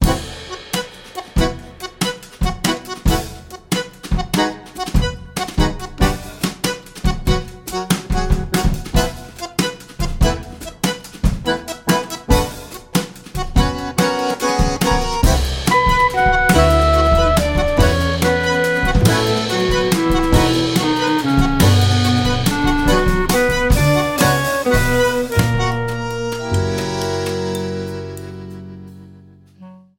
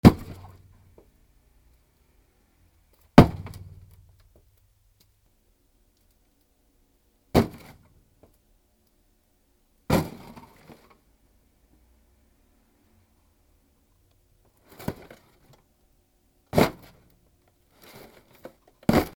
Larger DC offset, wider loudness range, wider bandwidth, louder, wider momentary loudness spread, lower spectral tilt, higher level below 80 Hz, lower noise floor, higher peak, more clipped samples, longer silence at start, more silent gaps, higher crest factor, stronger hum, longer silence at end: neither; second, 7 LU vs 20 LU; second, 17 kHz vs over 20 kHz; first, -18 LUFS vs -23 LUFS; second, 12 LU vs 32 LU; second, -5 dB/octave vs -7 dB/octave; first, -24 dBFS vs -44 dBFS; second, -44 dBFS vs -66 dBFS; about the same, 0 dBFS vs 0 dBFS; neither; about the same, 0 s vs 0.05 s; neither; second, 16 dB vs 28 dB; neither; first, 0.2 s vs 0.05 s